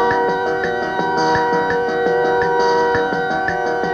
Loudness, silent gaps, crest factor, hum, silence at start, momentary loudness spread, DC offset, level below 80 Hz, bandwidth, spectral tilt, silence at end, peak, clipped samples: -17 LUFS; none; 12 dB; none; 0 s; 4 LU; under 0.1%; -46 dBFS; 7.8 kHz; -5 dB/octave; 0 s; -4 dBFS; under 0.1%